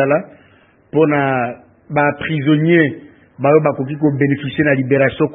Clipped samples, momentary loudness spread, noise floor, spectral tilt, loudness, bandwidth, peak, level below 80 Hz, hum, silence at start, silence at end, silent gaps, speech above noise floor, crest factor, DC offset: under 0.1%; 8 LU; -50 dBFS; -11.5 dB/octave; -16 LUFS; 3.9 kHz; 0 dBFS; -54 dBFS; none; 0 s; 0 s; none; 36 dB; 16 dB; under 0.1%